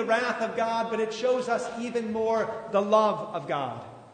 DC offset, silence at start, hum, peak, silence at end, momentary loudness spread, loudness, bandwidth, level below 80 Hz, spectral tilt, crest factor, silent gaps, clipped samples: under 0.1%; 0 s; none; -8 dBFS; 0 s; 8 LU; -27 LUFS; 9.6 kHz; -70 dBFS; -5 dB/octave; 18 dB; none; under 0.1%